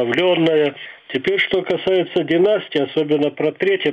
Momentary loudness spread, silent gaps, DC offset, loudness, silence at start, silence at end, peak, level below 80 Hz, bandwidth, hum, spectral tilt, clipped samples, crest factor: 6 LU; none; under 0.1%; -18 LUFS; 0 s; 0 s; -4 dBFS; -60 dBFS; 7.6 kHz; none; -7 dB/octave; under 0.1%; 14 dB